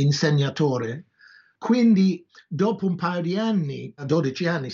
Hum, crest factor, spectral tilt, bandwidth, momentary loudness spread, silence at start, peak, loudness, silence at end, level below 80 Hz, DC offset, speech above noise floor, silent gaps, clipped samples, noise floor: none; 14 dB; -6.5 dB/octave; 7.4 kHz; 15 LU; 0 s; -8 dBFS; -23 LUFS; 0 s; -74 dBFS; under 0.1%; 32 dB; none; under 0.1%; -54 dBFS